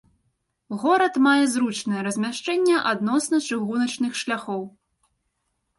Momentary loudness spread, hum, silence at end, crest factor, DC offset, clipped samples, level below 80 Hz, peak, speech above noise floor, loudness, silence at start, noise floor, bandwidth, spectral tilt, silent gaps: 9 LU; none; 1.1 s; 16 dB; under 0.1%; under 0.1%; -70 dBFS; -8 dBFS; 53 dB; -23 LUFS; 0.7 s; -75 dBFS; 11.5 kHz; -4 dB/octave; none